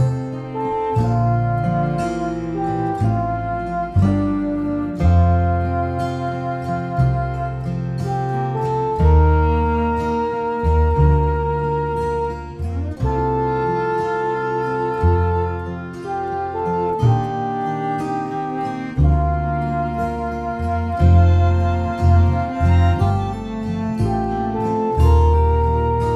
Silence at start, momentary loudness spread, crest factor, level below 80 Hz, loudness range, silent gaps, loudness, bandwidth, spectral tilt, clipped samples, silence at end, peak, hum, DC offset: 0 s; 9 LU; 16 dB; -26 dBFS; 4 LU; none; -19 LUFS; 7.6 kHz; -9 dB/octave; under 0.1%; 0 s; -2 dBFS; none; under 0.1%